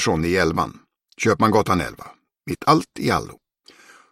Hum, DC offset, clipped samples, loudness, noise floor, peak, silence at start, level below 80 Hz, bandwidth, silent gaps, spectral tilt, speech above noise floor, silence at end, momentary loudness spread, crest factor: none; under 0.1%; under 0.1%; -21 LUFS; -51 dBFS; -2 dBFS; 0 s; -46 dBFS; 16 kHz; none; -5 dB/octave; 31 dB; 0.75 s; 15 LU; 20 dB